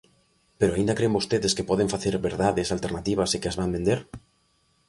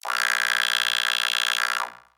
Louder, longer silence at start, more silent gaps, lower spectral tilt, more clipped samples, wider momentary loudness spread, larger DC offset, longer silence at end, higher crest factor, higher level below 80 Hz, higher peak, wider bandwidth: second, -25 LUFS vs -22 LUFS; first, 0.6 s vs 0.05 s; neither; first, -5 dB/octave vs 3.5 dB/octave; neither; about the same, 4 LU vs 3 LU; neither; first, 0.7 s vs 0.25 s; about the same, 18 dB vs 20 dB; first, -46 dBFS vs -74 dBFS; about the same, -8 dBFS vs -6 dBFS; second, 11.5 kHz vs over 20 kHz